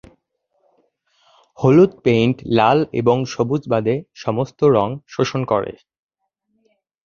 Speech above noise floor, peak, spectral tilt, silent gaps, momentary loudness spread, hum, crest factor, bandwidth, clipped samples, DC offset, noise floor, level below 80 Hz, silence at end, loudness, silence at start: 58 dB; -2 dBFS; -7 dB/octave; none; 9 LU; none; 18 dB; 7.2 kHz; under 0.1%; under 0.1%; -75 dBFS; -54 dBFS; 1.35 s; -18 LUFS; 1.6 s